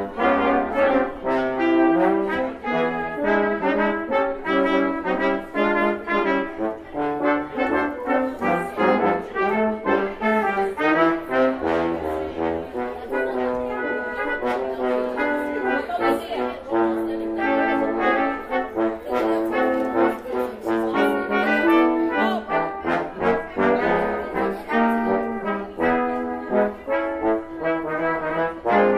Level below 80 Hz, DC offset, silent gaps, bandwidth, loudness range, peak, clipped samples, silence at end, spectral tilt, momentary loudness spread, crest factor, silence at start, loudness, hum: -50 dBFS; under 0.1%; none; 14.5 kHz; 3 LU; -6 dBFS; under 0.1%; 0 s; -6.5 dB/octave; 6 LU; 16 dB; 0 s; -22 LUFS; none